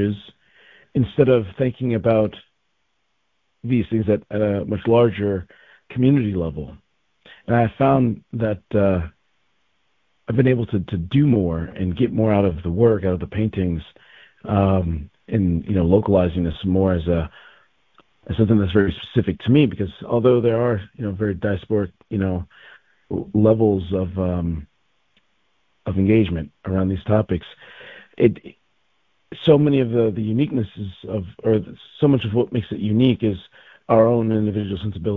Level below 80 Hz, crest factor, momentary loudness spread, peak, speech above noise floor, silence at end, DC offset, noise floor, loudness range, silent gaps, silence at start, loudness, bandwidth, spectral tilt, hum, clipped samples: -38 dBFS; 20 dB; 13 LU; 0 dBFS; 53 dB; 0 s; under 0.1%; -72 dBFS; 3 LU; none; 0 s; -20 LUFS; 4.1 kHz; -11 dB/octave; none; under 0.1%